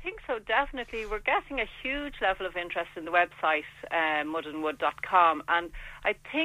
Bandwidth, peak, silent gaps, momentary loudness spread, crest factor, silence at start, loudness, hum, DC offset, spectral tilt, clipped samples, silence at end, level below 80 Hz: 15.5 kHz; -8 dBFS; none; 10 LU; 20 dB; 0 s; -29 LUFS; none; under 0.1%; -4.5 dB/octave; under 0.1%; 0 s; -50 dBFS